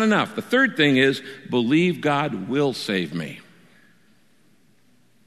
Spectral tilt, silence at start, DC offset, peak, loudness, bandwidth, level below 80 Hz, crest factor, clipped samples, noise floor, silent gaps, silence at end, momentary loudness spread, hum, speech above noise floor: -5.5 dB/octave; 0 s; 0.1%; -4 dBFS; -21 LUFS; 13.5 kHz; -68 dBFS; 20 dB; under 0.1%; -61 dBFS; none; 1.85 s; 13 LU; none; 40 dB